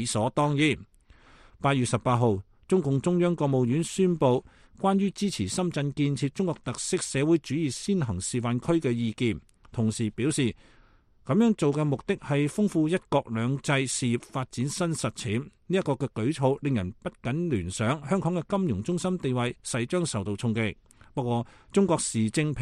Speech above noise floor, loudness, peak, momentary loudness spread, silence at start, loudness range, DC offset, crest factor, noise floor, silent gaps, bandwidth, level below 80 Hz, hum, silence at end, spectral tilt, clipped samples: 32 dB; -27 LUFS; -10 dBFS; 6 LU; 0 s; 3 LU; under 0.1%; 18 dB; -58 dBFS; none; 12.5 kHz; -56 dBFS; none; 0 s; -5.5 dB/octave; under 0.1%